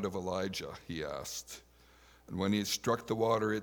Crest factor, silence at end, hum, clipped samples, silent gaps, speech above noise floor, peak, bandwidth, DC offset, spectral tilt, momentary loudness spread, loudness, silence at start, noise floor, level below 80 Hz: 20 dB; 0 s; none; under 0.1%; none; 27 dB; -16 dBFS; over 20 kHz; under 0.1%; -4.5 dB/octave; 12 LU; -35 LUFS; 0 s; -61 dBFS; -64 dBFS